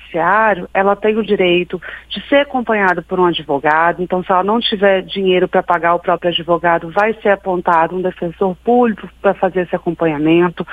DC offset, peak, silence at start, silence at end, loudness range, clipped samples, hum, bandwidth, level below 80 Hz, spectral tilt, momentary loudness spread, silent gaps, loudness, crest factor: under 0.1%; 0 dBFS; 0 s; 0 s; 1 LU; under 0.1%; none; 5 kHz; -46 dBFS; -7.5 dB/octave; 5 LU; none; -15 LUFS; 14 dB